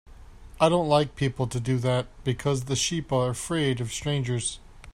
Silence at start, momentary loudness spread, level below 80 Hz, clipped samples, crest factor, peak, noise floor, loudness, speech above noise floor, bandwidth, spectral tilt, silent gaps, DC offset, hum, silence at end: 0.1 s; 7 LU; -48 dBFS; under 0.1%; 20 dB; -8 dBFS; -45 dBFS; -26 LUFS; 20 dB; 14 kHz; -5 dB/octave; none; under 0.1%; none; 0.05 s